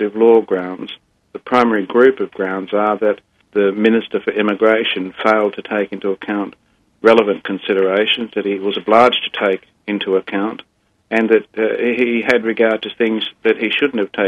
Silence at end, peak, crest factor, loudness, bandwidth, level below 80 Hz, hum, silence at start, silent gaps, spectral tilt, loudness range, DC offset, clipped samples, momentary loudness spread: 0 s; 0 dBFS; 16 dB; -16 LUFS; 8 kHz; -62 dBFS; none; 0 s; none; -6 dB/octave; 2 LU; under 0.1%; under 0.1%; 10 LU